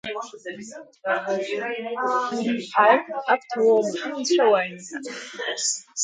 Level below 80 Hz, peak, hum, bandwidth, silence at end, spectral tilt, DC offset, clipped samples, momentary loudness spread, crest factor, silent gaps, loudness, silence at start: -74 dBFS; -4 dBFS; none; 9.6 kHz; 0 s; -2.5 dB/octave; under 0.1%; under 0.1%; 16 LU; 20 dB; none; -23 LUFS; 0.05 s